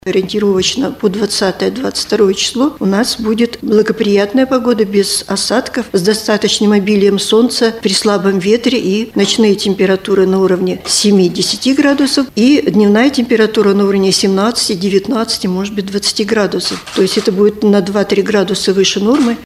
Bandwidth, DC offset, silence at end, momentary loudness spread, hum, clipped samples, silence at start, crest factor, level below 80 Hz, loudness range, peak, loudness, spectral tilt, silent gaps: 15 kHz; under 0.1%; 0 s; 5 LU; none; under 0.1%; 0.05 s; 12 dB; -46 dBFS; 3 LU; 0 dBFS; -12 LUFS; -4.5 dB/octave; none